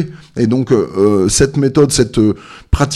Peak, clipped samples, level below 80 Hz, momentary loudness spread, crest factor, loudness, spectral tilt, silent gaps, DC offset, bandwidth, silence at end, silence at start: 0 dBFS; under 0.1%; -26 dBFS; 8 LU; 12 dB; -13 LUFS; -5.5 dB/octave; none; under 0.1%; 14 kHz; 0 s; 0 s